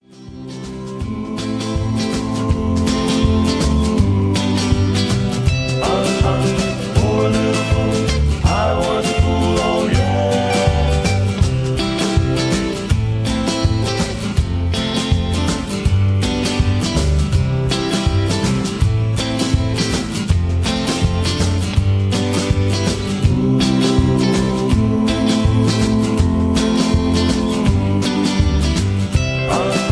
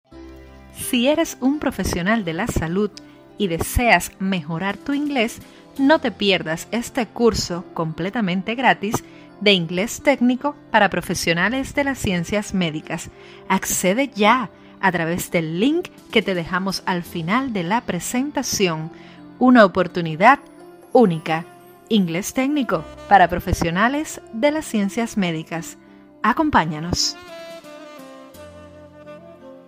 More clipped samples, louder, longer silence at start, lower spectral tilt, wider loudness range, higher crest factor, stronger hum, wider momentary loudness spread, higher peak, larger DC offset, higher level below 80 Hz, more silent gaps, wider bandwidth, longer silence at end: neither; first, -17 LUFS vs -20 LUFS; about the same, 0.15 s vs 0.1 s; first, -6 dB/octave vs -4.5 dB/octave; about the same, 2 LU vs 4 LU; second, 14 dB vs 20 dB; neither; second, 4 LU vs 12 LU; about the same, -2 dBFS vs 0 dBFS; neither; first, -24 dBFS vs -42 dBFS; neither; second, 11 kHz vs 16 kHz; about the same, 0 s vs 0.1 s